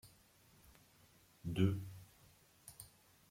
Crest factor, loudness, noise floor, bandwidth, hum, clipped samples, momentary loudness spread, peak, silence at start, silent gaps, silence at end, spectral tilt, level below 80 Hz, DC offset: 24 dB; -40 LUFS; -68 dBFS; 16.5 kHz; none; under 0.1%; 28 LU; -20 dBFS; 0.05 s; none; 0.45 s; -7 dB/octave; -70 dBFS; under 0.1%